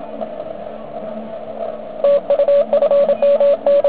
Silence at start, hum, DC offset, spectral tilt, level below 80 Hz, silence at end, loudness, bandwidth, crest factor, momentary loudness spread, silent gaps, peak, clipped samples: 0 s; none; 1%; -9 dB/octave; -56 dBFS; 0 s; -15 LUFS; 4 kHz; 12 dB; 16 LU; none; -4 dBFS; under 0.1%